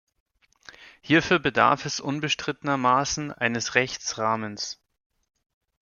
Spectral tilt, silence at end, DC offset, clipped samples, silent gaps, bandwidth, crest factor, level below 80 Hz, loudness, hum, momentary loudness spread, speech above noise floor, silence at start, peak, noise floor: -3.5 dB/octave; 1.1 s; under 0.1%; under 0.1%; none; 7.4 kHz; 22 dB; -58 dBFS; -24 LUFS; none; 9 LU; 27 dB; 0.8 s; -4 dBFS; -52 dBFS